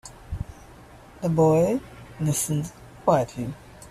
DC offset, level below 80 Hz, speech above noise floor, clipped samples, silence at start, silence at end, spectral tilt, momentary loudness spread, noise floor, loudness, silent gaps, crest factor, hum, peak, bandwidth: under 0.1%; -46 dBFS; 25 dB; under 0.1%; 0.05 s; 0 s; -6.5 dB/octave; 19 LU; -47 dBFS; -24 LUFS; none; 18 dB; none; -8 dBFS; 15 kHz